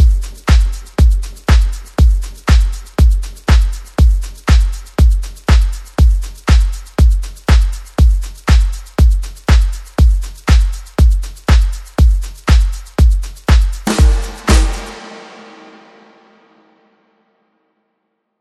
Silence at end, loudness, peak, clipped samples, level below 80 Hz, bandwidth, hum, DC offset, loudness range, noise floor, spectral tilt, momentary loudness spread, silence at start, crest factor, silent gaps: 3.15 s; -14 LUFS; 0 dBFS; under 0.1%; -12 dBFS; 12.5 kHz; none; under 0.1%; 3 LU; -69 dBFS; -6 dB/octave; 6 LU; 0 s; 12 dB; none